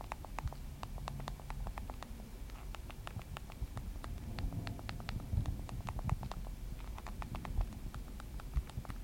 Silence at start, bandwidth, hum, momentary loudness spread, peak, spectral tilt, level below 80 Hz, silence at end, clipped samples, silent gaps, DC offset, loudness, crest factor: 0 s; 16.5 kHz; none; 8 LU; -20 dBFS; -6 dB/octave; -44 dBFS; 0 s; under 0.1%; none; under 0.1%; -45 LUFS; 22 dB